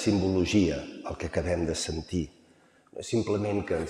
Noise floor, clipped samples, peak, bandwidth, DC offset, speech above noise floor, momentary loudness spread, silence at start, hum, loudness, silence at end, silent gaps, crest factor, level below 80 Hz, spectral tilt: -61 dBFS; under 0.1%; -12 dBFS; 12.5 kHz; under 0.1%; 33 dB; 13 LU; 0 s; none; -29 LUFS; 0 s; none; 18 dB; -50 dBFS; -5.5 dB/octave